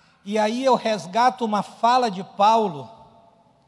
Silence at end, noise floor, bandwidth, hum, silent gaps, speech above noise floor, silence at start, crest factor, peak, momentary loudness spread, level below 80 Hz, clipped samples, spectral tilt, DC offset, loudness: 0.75 s; -56 dBFS; 12 kHz; none; none; 35 dB; 0.25 s; 16 dB; -6 dBFS; 9 LU; -74 dBFS; under 0.1%; -4.5 dB/octave; under 0.1%; -21 LUFS